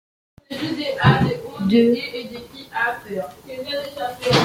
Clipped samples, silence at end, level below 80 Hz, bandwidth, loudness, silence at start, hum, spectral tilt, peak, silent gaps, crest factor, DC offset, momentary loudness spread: under 0.1%; 0 s; -50 dBFS; 16.5 kHz; -21 LUFS; 0.5 s; none; -6 dB/octave; -2 dBFS; none; 20 dB; under 0.1%; 16 LU